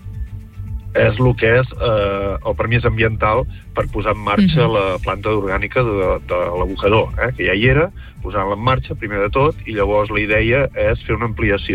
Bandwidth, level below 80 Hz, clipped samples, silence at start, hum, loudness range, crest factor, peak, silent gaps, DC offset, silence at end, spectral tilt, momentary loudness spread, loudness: 8.8 kHz; -30 dBFS; under 0.1%; 0.05 s; none; 1 LU; 16 dB; -2 dBFS; none; under 0.1%; 0 s; -8 dB/octave; 8 LU; -17 LUFS